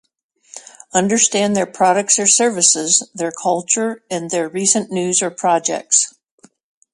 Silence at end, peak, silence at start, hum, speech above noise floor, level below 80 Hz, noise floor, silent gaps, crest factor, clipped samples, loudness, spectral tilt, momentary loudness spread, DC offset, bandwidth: 0.85 s; 0 dBFS; 0.55 s; none; 23 dB; -66 dBFS; -40 dBFS; none; 18 dB; under 0.1%; -15 LUFS; -2 dB/octave; 11 LU; under 0.1%; 11.5 kHz